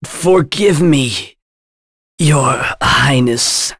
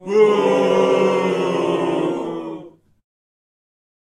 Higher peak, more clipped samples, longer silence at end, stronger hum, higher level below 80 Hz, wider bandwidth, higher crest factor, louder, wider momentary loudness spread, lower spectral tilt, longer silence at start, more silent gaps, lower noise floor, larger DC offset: about the same, -2 dBFS vs -4 dBFS; neither; second, 0.05 s vs 1.35 s; neither; first, -38 dBFS vs -66 dBFS; about the same, 11 kHz vs 11 kHz; about the same, 12 dB vs 16 dB; first, -12 LUFS vs -18 LUFS; second, 6 LU vs 14 LU; second, -4 dB/octave vs -6 dB/octave; about the same, 0 s vs 0 s; first, 1.42-2.18 s vs none; first, under -90 dBFS vs -39 dBFS; neither